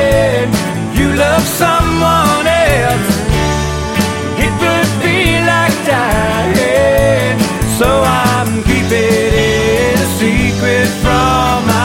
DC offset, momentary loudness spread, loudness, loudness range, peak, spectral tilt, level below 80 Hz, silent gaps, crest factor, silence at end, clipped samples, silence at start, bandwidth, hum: under 0.1%; 4 LU; -12 LUFS; 1 LU; 0 dBFS; -5 dB/octave; -24 dBFS; none; 12 dB; 0 s; under 0.1%; 0 s; 17 kHz; none